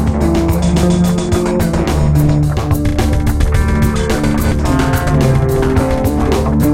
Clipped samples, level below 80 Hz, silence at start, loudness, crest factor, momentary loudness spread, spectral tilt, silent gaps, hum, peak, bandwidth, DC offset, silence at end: under 0.1%; -18 dBFS; 0 s; -14 LUFS; 12 dB; 3 LU; -7 dB/octave; none; none; 0 dBFS; 16.5 kHz; under 0.1%; 0 s